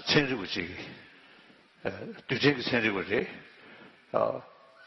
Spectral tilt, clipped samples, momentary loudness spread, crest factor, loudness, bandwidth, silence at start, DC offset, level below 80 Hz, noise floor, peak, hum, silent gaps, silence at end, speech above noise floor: -5.5 dB/octave; under 0.1%; 23 LU; 24 dB; -30 LUFS; 6.4 kHz; 0 s; under 0.1%; -64 dBFS; -58 dBFS; -8 dBFS; none; none; 0 s; 28 dB